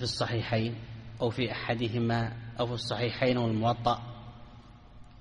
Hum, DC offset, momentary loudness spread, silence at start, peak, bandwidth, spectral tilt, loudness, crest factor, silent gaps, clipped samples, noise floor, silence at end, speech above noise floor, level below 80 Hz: none; under 0.1%; 16 LU; 0 s; -12 dBFS; 10 kHz; -6 dB/octave; -31 LUFS; 18 dB; none; under 0.1%; -51 dBFS; 0 s; 21 dB; -54 dBFS